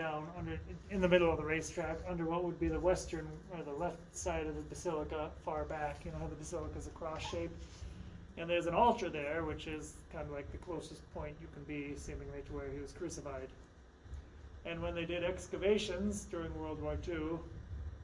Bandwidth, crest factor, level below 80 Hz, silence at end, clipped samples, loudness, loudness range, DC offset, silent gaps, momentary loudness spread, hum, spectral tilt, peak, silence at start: 11.5 kHz; 24 dB; -52 dBFS; 0 s; under 0.1%; -39 LUFS; 10 LU; under 0.1%; none; 15 LU; none; -5.5 dB/octave; -14 dBFS; 0 s